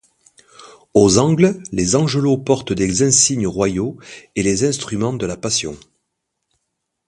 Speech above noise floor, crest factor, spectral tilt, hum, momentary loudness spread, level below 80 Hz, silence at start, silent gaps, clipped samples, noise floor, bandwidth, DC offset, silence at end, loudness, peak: 59 dB; 18 dB; -4.5 dB/octave; none; 11 LU; -44 dBFS; 0.6 s; none; under 0.1%; -75 dBFS; 11.5 kHz; under 0.1%; 1.3 s; -17 LUFS; 0 dBFS